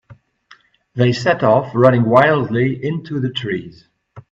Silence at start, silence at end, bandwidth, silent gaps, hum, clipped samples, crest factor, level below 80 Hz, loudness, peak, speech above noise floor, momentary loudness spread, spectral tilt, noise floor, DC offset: 0.1 s; 0.1 s; 7.6 kHz; none; none; under 0.1%; 18 dB; -54 dBFS; -16 LUFS; 0 dBFS; 35 dB; 11 LU; -7.5 dB/octave; -50 dBFS; under 0.1%